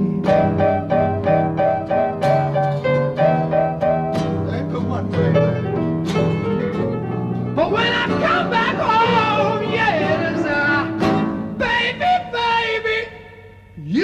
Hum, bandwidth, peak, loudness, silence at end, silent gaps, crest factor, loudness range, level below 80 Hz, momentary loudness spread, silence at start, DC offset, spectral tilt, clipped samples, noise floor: none; 9 kHz; -4 dBFS; -19 LUFS; 0 s; none; 14 dB; 3 LU; -46 dBFS; 6 LU; 0 s; under 0.1%; -7 dB/octave; under 0.1%; -42 dBFS